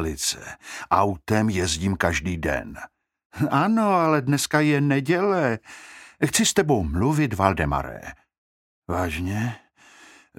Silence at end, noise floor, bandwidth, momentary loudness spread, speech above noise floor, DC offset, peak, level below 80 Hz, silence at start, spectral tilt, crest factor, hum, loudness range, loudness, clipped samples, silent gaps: 0.8 s; -51 dBFS; 16.5 kHz; 17 LU; 29 dB; under 0.1%; -2 dBFS; -42 dBFS; 0 s; -5 dB/octave; 22 dB; none; 4 LU; -23 LUFS; under 0.1%; 3.25-3.30 s, 8.38-8.82 s